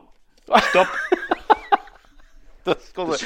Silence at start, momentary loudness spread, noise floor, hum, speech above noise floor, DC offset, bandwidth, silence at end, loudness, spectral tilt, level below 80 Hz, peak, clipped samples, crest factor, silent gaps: 0.5 s; 9 LU; -49 dBFS; none; 30 dB; under 0.1%; 16.5 kHz; 0 s; -20 LUFS; -3.5 dB/octave; -50 dBFS; 0 dBFS; under 0.1%; 22 dB; none